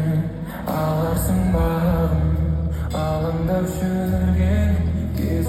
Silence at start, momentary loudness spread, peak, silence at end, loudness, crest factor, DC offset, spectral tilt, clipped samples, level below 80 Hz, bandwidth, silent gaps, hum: 0 s; 5 LU; -8 dBFS; 0 s; -21 LUFS; 12 dB; under 0.1%; -7.5 dB/octave; under 0.1%; -26 dBFS; 15 kHz; none; none